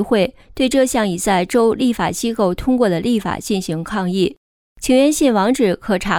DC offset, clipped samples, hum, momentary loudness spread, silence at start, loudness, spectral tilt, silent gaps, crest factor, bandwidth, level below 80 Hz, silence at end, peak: under 0.1%; under 0.1%; none; 7 LU; 0 s; -17 LUFS; -5 dB/octave; 4.37-4.76 s; 14 dB; 18 kHz; -40 dBFS; 0 s; -4 dBFS